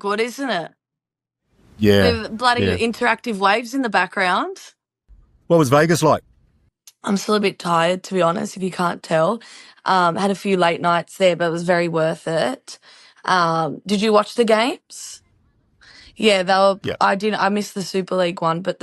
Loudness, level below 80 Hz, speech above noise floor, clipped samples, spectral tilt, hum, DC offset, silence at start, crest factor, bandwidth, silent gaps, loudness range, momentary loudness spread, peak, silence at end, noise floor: -19 LUFS; -54 dBFS; 67 dB; under 0.1%; -5 dB/octave; none; under 0.1%; 0.05 s; 18 dB; 14.5 kHz; none; 2 LU; 9 LU; 0 dBFS; 0.1 s; -86 dBFS